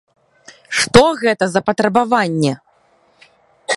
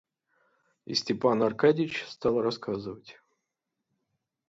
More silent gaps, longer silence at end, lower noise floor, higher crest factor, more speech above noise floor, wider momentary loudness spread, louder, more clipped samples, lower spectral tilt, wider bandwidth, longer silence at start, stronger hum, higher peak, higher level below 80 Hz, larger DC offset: neither; second, 0 s vs 1.4 s; second, -56 dBFS vs -85 dBFS; about the same, 18 dB vs 20 dB; second, 42 dB vs 57 dB; about the same, 10 LU vs 12 LU; first, -15 LUFS vs -28 LUFS; neither; about the same, -4.5 dB/octave vs -5.5 dB/octave; first, 11.5 kHz vs 7.8 kHz; second, 0.7 s vs 0.9 s; neither; first, 0 dBFS vs -10 dBFS; first, -48 dBFS vs -68 dBFS; neither